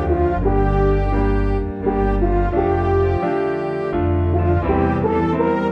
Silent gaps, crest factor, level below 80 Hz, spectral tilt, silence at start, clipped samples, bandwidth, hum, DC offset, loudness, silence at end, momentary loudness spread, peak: none; 14 dB; -24 dBFS; -10 dB/octave; 0 s; under 0.1%; 5.8 kHz; none; under 0.1%; -19 LUFS; 0 s; 4 LU; -4 dBFS